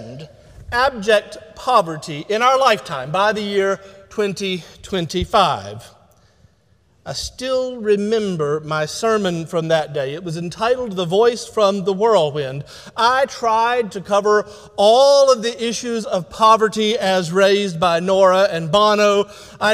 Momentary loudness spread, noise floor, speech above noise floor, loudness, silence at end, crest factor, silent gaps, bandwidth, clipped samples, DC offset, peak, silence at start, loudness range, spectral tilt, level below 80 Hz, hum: 13 LU; -58 dBFS; 40 dB; -17 LUFS; 0 s; 16 dB; none; 15.5 kHz; under 0.1%; under 0.1%; -2 dBFS; 0 s; 7 LU; -4 dB/octave; -48 dBFS; none